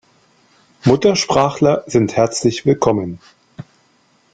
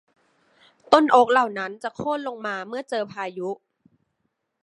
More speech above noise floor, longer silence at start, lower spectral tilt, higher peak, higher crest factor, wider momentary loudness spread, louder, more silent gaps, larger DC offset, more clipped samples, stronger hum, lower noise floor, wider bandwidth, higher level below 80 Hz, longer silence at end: second, 42 dB vs 54 dB; about the same, 0.85 s vs 0.9 s; about the same, -5.5 dB/octave vs -4.5 dB/octave; about the same, -2 dBFS vs 0 dBFS; second, 16 dB vs 24 dB; second, 7 LU vs 15 LU; first, -16 LUFS vs -23 LUFS; neither; neither; neither; neither; second, -57 dBFS vs -76 dBFS; second, 9.4 kHz vs 11.5 kHz; first, -50 dBFS vs -70 dBFS; second, 0.7 s vs 1.1 s